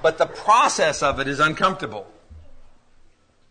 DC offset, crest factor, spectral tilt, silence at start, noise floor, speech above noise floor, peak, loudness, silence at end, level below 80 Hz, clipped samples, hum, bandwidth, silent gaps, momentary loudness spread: under 0.1%; 18 dB; -3 dB/octave; 0 s; -54 dBFS; 34 dB; -4 dBFS; -19 LUFS; 0.85 s; -46 dBFS; under 0.1%; none; 9.6 kHz; none; 14 LU